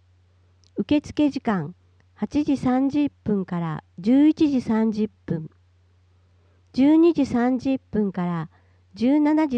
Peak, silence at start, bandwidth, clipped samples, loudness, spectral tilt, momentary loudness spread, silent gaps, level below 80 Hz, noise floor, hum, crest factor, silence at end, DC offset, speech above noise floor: -10 dBFS; 0.75 s; 8.2 kHz; under 0.1%; -22 LUFS; -8 dB/octave; 13 LU; none; -56 dBFS; -58 dBFS; none; 12 dB; 0 s; under 0.1%; 37 dB